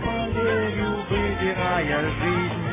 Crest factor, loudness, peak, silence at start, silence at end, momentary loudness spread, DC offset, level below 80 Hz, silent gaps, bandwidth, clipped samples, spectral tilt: 14 dB; -24 LUFS; -10 dBFS; 0 s; 0 s; 2 LU; under 0.1%; -38 dBFS; none; 3.8 kHz; under 0.1%; -10 dB/octave